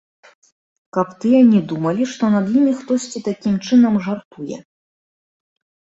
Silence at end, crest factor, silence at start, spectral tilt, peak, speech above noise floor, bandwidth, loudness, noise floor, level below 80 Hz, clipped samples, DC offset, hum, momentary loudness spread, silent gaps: 1.25 s; 16 dB; 0.95 s; -6.5 dB/octave; -2 dBFS; over 74 dB; 8 kHz; -17 LUFS; under -90 dBFS; -60 dBFS; under 0.1%; under 0.1%; none; 15 LU; 4.25-4.31 s